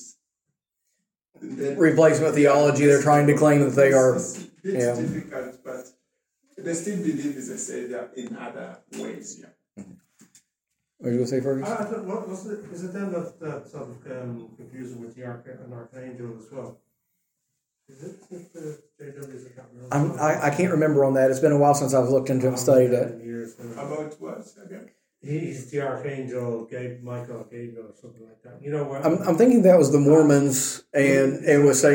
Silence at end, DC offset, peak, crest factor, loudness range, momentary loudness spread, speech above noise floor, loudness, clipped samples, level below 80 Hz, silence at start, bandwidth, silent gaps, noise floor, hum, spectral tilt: 0 s; under 0.1%; -4 dBFS; 18 dB; 20 LU; 23 LU; 59 dB; -21 LUFS; under 0.1%; -68 dBFS; 0 s; 17 kHz; none; -82 dBFS; none; -6 dB/octave